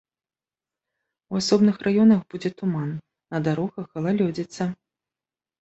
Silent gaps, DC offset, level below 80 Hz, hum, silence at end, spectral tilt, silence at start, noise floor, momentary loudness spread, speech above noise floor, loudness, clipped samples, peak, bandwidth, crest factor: none; under 0.1%; -62 dBFS; none; 0.85 s; -6.5 dB/octave; 1.3 s; under -90 dBFS; 13 LU; over 68 dB; -23 LUFS; under 0.1%; -6 dBFS; 8.2 kHz; 20 dB